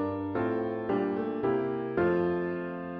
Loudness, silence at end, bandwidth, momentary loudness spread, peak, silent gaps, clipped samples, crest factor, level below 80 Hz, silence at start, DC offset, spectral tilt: -30 LUFS; 0 s; 5 kHz; 5 LU; -16 dBFS; none; under 0.1%; 14 dB; -62 dBFS; 0 s; under 0.1%; -10 dB/octave